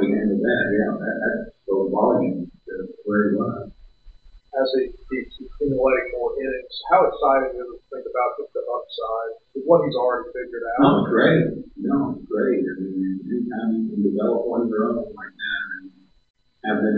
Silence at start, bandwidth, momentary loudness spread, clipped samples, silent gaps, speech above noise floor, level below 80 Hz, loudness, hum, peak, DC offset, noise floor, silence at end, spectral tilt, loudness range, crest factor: 0 s; 5 kHz; 14 LU; under 0.1%; 16.30-16.34 s; 27 dB; -50 dBFS; -22 LUFS; none; -2 dBFS; under 0.1%; -47 dBFS; 0 s; -10 dB/octave; 5 LU; 20 dB